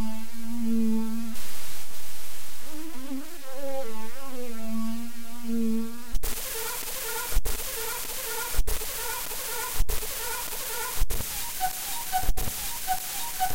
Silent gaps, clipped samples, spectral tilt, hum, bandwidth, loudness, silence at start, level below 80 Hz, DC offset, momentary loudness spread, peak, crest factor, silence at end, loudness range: none; under 0.1%; -3 dB/octave; none; 17 kHz; -31 LUFS; 0 s; -36 dBFS; under 0.1%; 11 LU; -10 dBFS; 14 dB; 0 s; 7 LU